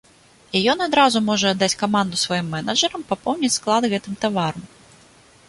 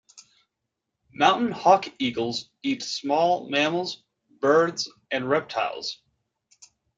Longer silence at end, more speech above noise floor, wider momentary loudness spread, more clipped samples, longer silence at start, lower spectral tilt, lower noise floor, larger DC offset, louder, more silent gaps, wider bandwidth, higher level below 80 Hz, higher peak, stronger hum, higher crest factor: second, 0.85 s vs 1.05 s; second, 32 dB vs 59 dB; second, 8 LU vs 12 LU; neither; first, 0.55 s vs 0.15 s; about the same, -3.5 dB/octave vs -4 dB/octave; second, -52 dBFS vs -83 dBFS; neither; first, -20 LUFS vs -24 LUFS; neither; first, 11.5 kHz vs 9.2 kHz; first, -58 dBFS vs -70 dBFS; about the same, -2 dBFS vs -4 dBFS; neither; about the same, 18 dB vs 22 dB